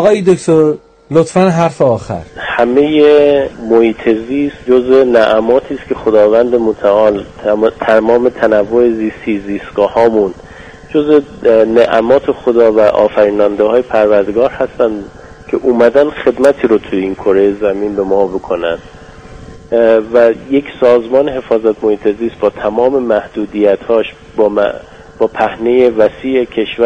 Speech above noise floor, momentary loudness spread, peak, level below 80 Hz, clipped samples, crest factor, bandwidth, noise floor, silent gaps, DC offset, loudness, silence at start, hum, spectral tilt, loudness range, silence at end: 22 dB; 8 LU; 0 dBFS; -42 dBFS; 0.1%; 10 dB; 9.4 kHz; -33 dBFS; none; under 0.1%; -11 LUFS; 0 s; none; -6.5 dB/octave; 3 LU; 0 s